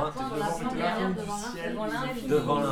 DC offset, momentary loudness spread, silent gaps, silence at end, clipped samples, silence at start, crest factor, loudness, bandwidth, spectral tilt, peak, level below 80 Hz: under 0.1%; 7 LU; none; 0 s; under 0.1%; 0 s; 16 dB; -30 LUFS; 17.5 kHz; -5.5 dB/octave; -14 dBFS; -50 dBFS